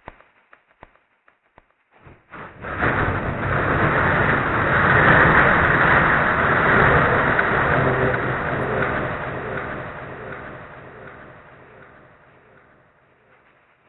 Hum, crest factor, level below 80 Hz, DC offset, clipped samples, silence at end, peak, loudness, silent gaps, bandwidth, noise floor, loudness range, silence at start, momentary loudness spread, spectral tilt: none; 20 dB; -38 dBFS; under 0.1%; under 0.1%; 2.5 s; -2 dBFS; -18 LUFS; none; 4.2 kHz; -61 dBFS; 16 LU; 2.35 s; 21 LU; -8.5 dB/octave